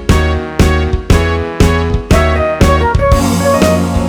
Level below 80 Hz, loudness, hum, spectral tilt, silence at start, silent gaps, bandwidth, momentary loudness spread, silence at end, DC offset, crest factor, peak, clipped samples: -16 dBFS; -11 LUFS; none; -6 dB/octave; 0 s; none; 19.5 kHz; 3 LU; 0 s; under 0.1%; 10 dB; 0 dBFS; 0.5%